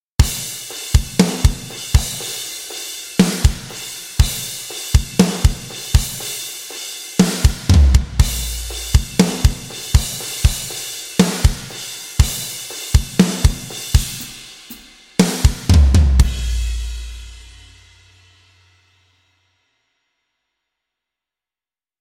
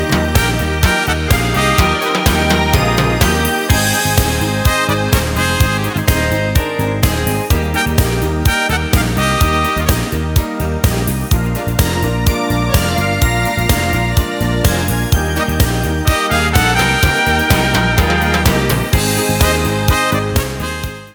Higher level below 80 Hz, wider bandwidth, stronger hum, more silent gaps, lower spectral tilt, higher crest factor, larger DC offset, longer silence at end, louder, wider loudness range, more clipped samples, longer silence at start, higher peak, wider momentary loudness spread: about the same, -20 dBFS vs -22 dBFS; second, 17 kHz vs over 20 kHz; neither; neither; about the same, -4.5 dB/octave vs -4.5 dB/octave; about the same, 18 dB vs 14 dB; neither; first, 4.5 s vs 0.05 s; second, -18 LUFS vs -14 LUFS; about the same, 3 LU vs 2 LU; neither; first, 0.2 s vs 0 s; about the same, 0 dBFS vs 0 dBFS; first, 13 LU vs 4 LU